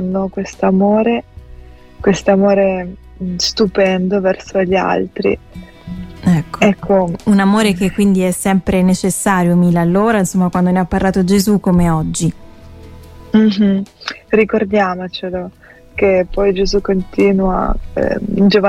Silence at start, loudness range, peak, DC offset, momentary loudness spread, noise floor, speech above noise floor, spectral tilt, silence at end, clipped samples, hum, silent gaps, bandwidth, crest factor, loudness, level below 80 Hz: 0 s; 3 LU; 0 dBFS; under 0.1%; 10 LU; -36 dBFS; 23 dB; -6 dB/octave; 0 s; under 0.1%; none; none; 15.5 kHz; 14 dB; -14 LUFS; -32 dBFS